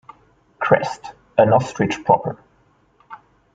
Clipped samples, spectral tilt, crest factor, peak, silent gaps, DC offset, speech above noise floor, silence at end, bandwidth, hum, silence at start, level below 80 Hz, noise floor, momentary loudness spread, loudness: under 0.1%; -6.5 dB/octave; 20 dB; 0 dBFS; none; under 0.1%; 41 dB; 0.4 s; 9 kHz; none; 0.6 s; -56 dBFS; -58 dBFS; 15 LU; -19 LUFS